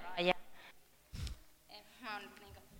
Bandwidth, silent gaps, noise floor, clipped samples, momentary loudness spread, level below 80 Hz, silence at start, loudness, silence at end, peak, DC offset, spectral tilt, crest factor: over 20 kHz; none; -61 dBFS; under 0.1%; 23 LU; -56 dBFS; 0 s; -41 LUFS; 0 s; -16 dBFS; under 0.1%; -4.5 dB/octave; 26 dB